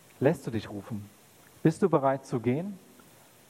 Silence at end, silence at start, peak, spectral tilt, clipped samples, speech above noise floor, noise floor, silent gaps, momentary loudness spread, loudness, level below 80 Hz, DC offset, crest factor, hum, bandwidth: 0.7 s; 0.2 s; -8 dBFS; -7.5 dB/octave; under 0.1%; 28 dB; -56 dBFS; none; 15 LU; -29 LUFS; -68 dBFS; under 0.1%; 22 dB; none; 16.5 kHz